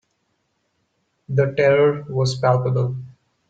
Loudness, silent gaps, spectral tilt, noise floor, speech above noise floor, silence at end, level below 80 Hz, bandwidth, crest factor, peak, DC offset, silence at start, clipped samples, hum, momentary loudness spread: -19 LUFS; none; -6.5 dB/octave; -70 dBFS; 52 dB; 0.4 s; -58 dBFS; 9 kHz; 18 dB; -4 dBFS; under 0.1%; 1.3 s; under 0.1%; none; 9 LU